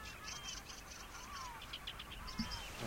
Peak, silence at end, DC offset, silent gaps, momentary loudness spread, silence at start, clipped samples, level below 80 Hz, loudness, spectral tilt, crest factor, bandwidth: -28 dBFS; 0 s; under 0.1%; none; 6 LU; 0 s; under 0.1%; -56 dBFS; -47 LUFS; -2.5 dB/octave; 20 dB; 16.5 kHz